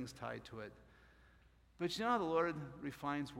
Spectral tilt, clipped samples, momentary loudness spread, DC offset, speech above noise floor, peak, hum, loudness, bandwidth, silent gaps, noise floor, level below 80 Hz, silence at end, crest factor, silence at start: -5.5 dB/octave; under 0.1%; 16 LU; under 0.1%; 27 dB; -24 dBFS; none; -40 LUFS; 16.5 kHz; none; -68 dBFS; -68 dBFS; 0 s; 20 dB; 0 s